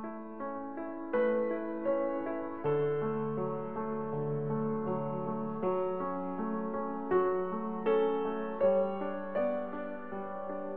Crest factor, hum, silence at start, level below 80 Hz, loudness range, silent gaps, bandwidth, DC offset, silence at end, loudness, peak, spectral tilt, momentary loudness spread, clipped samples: 16 dB; none; 0 s; -70 dBFS; 3 LU; none; 4.2 kHz; 0.4%; 0 s; -34 LUFS; -18 dBFS; -7 dB/octave; 10 LU; under 0.1%